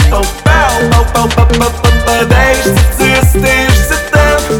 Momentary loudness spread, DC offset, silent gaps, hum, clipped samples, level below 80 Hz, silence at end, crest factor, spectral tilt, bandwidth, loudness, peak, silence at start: 2 LU; 0.5%; none; none; 0.2%; -12 dBFS; 0 s; 8 dB; -4.5 dB/octave; 18.5 kHz; -9 LUFS; 0 dBFS; 0 s